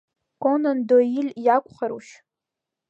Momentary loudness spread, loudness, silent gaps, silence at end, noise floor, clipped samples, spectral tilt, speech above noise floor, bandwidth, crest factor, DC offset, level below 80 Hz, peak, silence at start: 12 LU; -22 LUFS; none; 0.9 s; -86 dBFS; under 0.1%; -6.5 dB/octave; 65 dB; 8 kHz; 18 dB; under 0.1%; -76 dBFS; -6 dBFS; 0.4 s